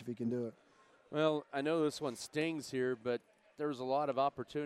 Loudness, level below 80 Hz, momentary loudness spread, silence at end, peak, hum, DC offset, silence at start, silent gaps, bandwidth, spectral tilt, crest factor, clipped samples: -37 LUFS; -80 dBFS; 7 LU; 0 s; -18 dBFS; none; under 0.1%; 0 s; none; 15 kHz; -5.5 dB/octave; 20 dB; under 0.1%